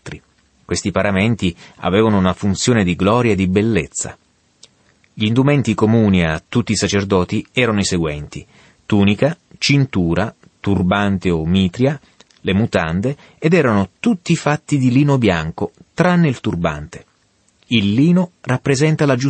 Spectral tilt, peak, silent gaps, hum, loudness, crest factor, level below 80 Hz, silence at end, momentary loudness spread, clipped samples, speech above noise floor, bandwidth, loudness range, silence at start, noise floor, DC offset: -6 dB/octave; -2 dBFS; none; none; -17 LUFS; 14 dB; -42 dBFS; 0 s; 11 LU; under 0.1%; 43 dB; 8.8 kHz; 2 LU; 0.05 s; -59 dBFS; under 0.1%